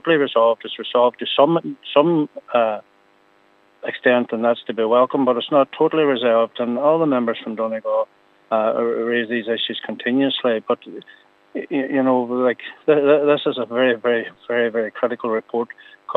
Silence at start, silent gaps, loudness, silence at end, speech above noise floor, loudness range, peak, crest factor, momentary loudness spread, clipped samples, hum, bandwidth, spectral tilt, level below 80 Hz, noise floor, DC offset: 0.05 s; none; -19 LUFS; 0 s; 37 dB; 3 LU; 0 dBFS; 20 dB; 8 LU; under 0.1%; none; 4.2 kHz; -8 dB/octave; -80 dBFS; -56 dBFS; under 0.1%